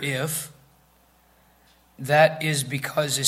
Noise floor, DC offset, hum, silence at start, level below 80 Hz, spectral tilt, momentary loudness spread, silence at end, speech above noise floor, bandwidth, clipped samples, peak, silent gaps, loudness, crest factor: -59 dBFS; under 0.1%; none; 0 s; -64 dBFS; -3.5 dB/octave; 15 LU; 0 s; 36 dB; 16 kHz; under 0.1%; -4 dBFS; none; -23 LUFS; 22 dB